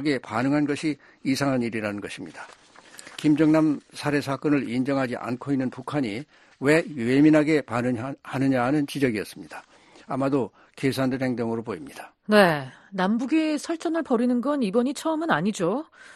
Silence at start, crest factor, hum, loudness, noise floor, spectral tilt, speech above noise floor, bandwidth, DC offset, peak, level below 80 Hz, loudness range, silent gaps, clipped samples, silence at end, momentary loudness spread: 0 s; 20 dB; none; -24 LUFS; -47 dBFS; -6 dB/octave; 23 dB; 13 kHz; under 0.1%; -4 dBFS; -62 dBFS; 4 LU; none; under 0.1%; 0.05 s; 15 LU